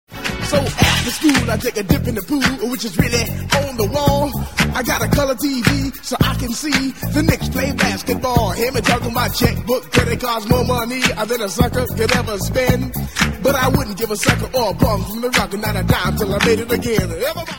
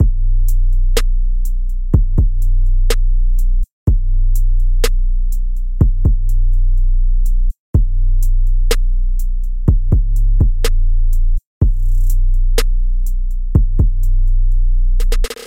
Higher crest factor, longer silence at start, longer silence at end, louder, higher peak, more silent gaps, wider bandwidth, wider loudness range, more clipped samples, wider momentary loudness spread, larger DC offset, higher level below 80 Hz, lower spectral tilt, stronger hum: first, 18 dB vs 10 dB; about the same, 0.1 s vs 0 s; about the same, 0 s vs 0 s; about the same, -17 LUFS vs -19 LUFS; about the same, 0 dBFS vs 0 dBFS; second, none vs 3.72-3.87 s, 7.59-7.73 s, 11.46-11.61 s; first, 17.5 kHz vs 12.5 kHz; about the same, 1 LU vs 1 LU; neither; about the same, 5 LU vs 5 LU; about the same, 0.8% vs 0.6%; second, -30 dBFS vs -12 dBFS; second, -4.5 dB/octave vs -6 dB/octave; neither